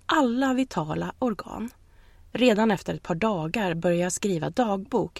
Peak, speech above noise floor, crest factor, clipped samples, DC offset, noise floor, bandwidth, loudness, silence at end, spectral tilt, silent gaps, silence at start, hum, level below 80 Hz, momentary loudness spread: -8 dBFS; 27 dB; 18 dB; under 0.1%; under 0.1%; -52 dBFS; 14 kHz; -26 LUFS; 0 s; -5 dB/octave; none; 0.1 s; none; -54 dBFS; 10 LU